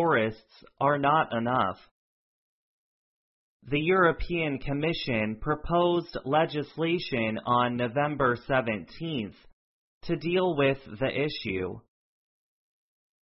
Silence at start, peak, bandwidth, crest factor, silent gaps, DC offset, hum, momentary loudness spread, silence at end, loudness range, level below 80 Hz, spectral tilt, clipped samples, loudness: 0 s; -10 dBFS; 5.8 kHz; 18 dB; 1.91-3.60 s, 9.53-10.01 s; under 0.1%; none; 9 LU; 1.4 s; 3 LU; -50 dBFS; -10 dB/octave; under 0.1%; -28 LUFS